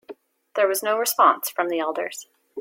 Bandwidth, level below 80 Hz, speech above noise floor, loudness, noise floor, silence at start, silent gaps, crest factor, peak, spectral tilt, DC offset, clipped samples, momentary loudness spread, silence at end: 16.5 kHz; -80 dBFS; 23 dB; -22 LUFS; -45 dBFS; 0.1 s; none; 20 dB; -4 dBFS; -1 dB/octave; under 0.1%; under 0.1%; 14 LU; 0 s